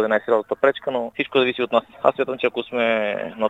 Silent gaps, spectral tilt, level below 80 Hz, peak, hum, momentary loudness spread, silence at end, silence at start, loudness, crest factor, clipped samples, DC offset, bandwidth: none; -6 dB/octave; -66 dBFS; 0 dBFS; none; 5 LU; 0 s; 0 s; -21 LUFS; 20 dB; under 0.1%; under 0.1%; 7.8 kHz